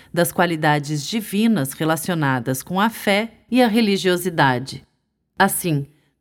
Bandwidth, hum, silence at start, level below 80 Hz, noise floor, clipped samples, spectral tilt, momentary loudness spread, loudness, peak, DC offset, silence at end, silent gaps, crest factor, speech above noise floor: 17.5 kHz; none; 0.15 s; -58 dBFS; -69 dBFS; under 0.1%; -5 dB/octave; 7 LU; -20 LUFS; -4 dBFS; under 0.1%; 0.35 s; none; 16 dB; 50 dB